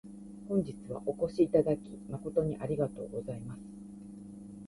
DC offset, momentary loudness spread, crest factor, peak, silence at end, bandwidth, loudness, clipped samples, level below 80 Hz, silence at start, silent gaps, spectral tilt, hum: under 0.1%; 20 LU; 20 dB; -14 dBFS; 0 s; 11.5 kHz; -33 LUFS; under 0.1%; -60 dBFS; 0.05 s; none; -9 dB/octave; none